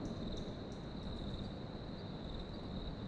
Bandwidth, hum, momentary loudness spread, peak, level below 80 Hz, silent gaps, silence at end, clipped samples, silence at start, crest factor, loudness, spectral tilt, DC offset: 10 kHz; none; 3 LU; -32 dBFS; -50 dBFS; none; 0 s; under 0.1%; 0 s; 12 dB; -46 LUFS; -7 dB/octave; under 0.1%